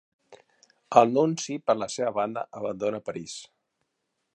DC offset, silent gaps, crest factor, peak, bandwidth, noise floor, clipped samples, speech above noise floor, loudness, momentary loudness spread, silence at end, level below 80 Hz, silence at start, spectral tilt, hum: under 0.1%; none; 26 dB; -2 dBFS; 11 kHz; -79 dBFS; under 0.1%; 53 dB; -26 LUFS; 15 LU; 0.9 s; -72 dBFS; 0.3 s; -5 dB/octave; none